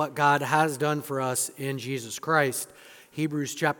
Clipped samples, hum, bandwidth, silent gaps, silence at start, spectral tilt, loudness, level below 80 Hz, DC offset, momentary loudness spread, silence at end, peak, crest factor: under 0.1%; none; 18 kHz; none; 0 s; -4 dB/octave; -26 LUFS; -74 dBFS; under 0.1%; 10 LU; 0.05 s; -6 dBFS; 20 dB